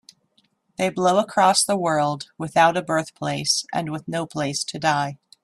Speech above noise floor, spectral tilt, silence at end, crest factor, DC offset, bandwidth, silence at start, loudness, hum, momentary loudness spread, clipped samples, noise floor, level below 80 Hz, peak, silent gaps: 44 dB; -3.5 dB/octave; 0.3 s; 18 dB; under 0.1%; 15.5 kHz; 0.8 s; -22 LUFS; none; 10 LU; under 0.1%; -65 dBFS; -64 dBFS; -4 dBFS; none